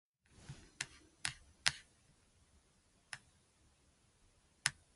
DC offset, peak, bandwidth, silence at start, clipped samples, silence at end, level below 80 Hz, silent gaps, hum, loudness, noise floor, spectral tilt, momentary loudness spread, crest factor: under 0.1%; -6 dBFS; 11.5 kHz; 0.4 s; under 0.1%; 0.25 s; -70 dBFS; none; none; -42 LUFS; -73 dBFS; 0 dB/octave; 19 LU; 42 dB